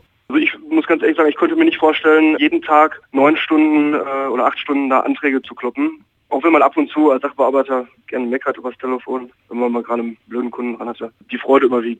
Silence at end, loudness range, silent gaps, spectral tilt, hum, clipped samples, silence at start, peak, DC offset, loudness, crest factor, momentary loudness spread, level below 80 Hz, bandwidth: 0.05 s; 8 LU; none; -6 dB/octave; none; under 0.1%; 0.3 s; 0 dBFS; under 0.1%; -16 LUFS; 16 dB; 12 LU; -66 dBFS; 4.1 kHz